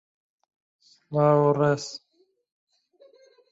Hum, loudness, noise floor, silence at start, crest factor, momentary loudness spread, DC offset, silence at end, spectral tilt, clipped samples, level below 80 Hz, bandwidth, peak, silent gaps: none; -23 LUFS; -58 dBFS; 1.1 s; 20 dB; 17 LU; under 0.1%; 1.55 s; -7 dB/octave; under 0.1%; -68 dBFS; 8 kHz; -6 dBFS; none